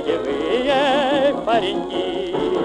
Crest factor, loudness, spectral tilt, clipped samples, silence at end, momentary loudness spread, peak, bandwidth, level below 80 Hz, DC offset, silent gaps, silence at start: 12 dB; -19 LUFS; -5 dB/octave; under 0.1%; 0 s; 6 LU; -8 dBFS; 10.5 kHz; -48 dBFS; under 0.1%; none; 0 s